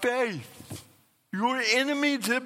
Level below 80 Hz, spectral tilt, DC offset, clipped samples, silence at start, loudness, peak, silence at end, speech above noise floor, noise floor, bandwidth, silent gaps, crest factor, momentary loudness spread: -72 dBFS; -3 dB/octave; under 0.1%; under 0.1%; 0 s; -26 LUFS; -10 dBFS; 0 s; 20 dB; -48 dBFS; 16.5 kHz; none; 18 dB; 20 LU